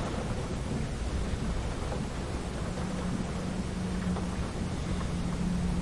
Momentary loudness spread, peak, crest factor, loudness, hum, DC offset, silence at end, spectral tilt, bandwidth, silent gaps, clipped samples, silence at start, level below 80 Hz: 3 LU; -20 dBFS; 12 dB; -34 LUFS; none; 0.2%; 0 s; -6 dB/octave; 11.5 kHz; none; under 0.1%; 0 s; -38 dBFS